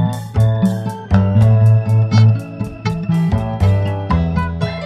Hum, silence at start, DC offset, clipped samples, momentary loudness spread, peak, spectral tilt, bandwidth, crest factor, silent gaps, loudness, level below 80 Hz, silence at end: none; 0 s; under 0.1%; under 0.1%; 9 LU; 0 dBFS; -8.5 dB/octave; 9 kHz; 14 dB; none; -15 LUFS; -30 dBFS; 0 s